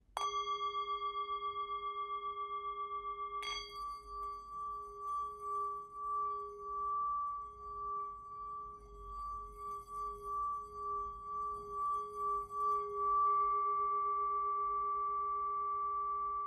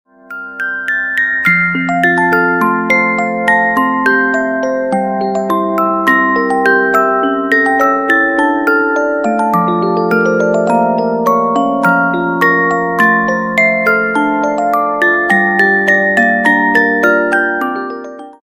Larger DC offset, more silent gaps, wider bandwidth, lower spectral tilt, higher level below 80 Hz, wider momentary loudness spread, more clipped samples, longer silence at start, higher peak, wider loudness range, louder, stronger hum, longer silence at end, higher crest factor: neither; neither; second, 12 kHz vs 16 kHz; second, -3 dB/octave vs -6 dB/octave; second, -62 dBFS vs -50 dBFS; first, 11 LU vs 6 LU; neither; second, 0.1 s vs 0.3 s; second, -22 dBFS vs 0 dBFS; first, 8 LU vs 2 LU; second, -39 LUFS vs -12 LUFS; neither; about the same, 0 s vs 0.1 s; about the same, 16 dB vs 12 dB